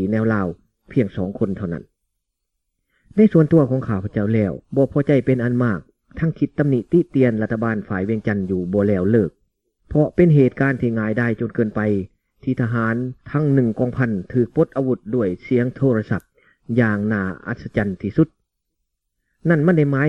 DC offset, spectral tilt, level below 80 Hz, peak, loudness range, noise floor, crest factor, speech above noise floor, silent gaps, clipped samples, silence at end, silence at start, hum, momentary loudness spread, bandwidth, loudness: 0.1%; -10.5 dB/octave; -48 dBFS; -2 dBFS; 3 LU; -78 dBFS; 16 dB; 59 dB; none; under 0.1%; 0 s; 0 s; none; 9 LU; 6 kHz; -20 LUFS